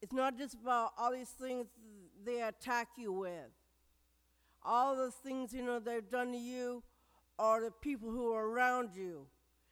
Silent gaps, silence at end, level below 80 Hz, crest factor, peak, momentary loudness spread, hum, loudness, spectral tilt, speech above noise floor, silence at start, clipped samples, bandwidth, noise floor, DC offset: none; 0.45 s; -70 dBFS; 18 dB; -22 dBFS; 13 LU; none; -38 LUFS; -4 dB/octave; 37 dB; 0 s; under 0.1%; 19 kHz; -75 dBFS; under 0.1%